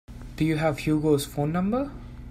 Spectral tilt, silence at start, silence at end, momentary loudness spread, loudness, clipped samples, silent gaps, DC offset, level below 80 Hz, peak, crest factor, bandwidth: -6.5 dB/octave; 0.1 s; 0 s; 13 LU; -26 LUFS; under 0.1%; none; under 0.1%; -44 dBFS; -10 dBFS; 16 dB; 16 kHz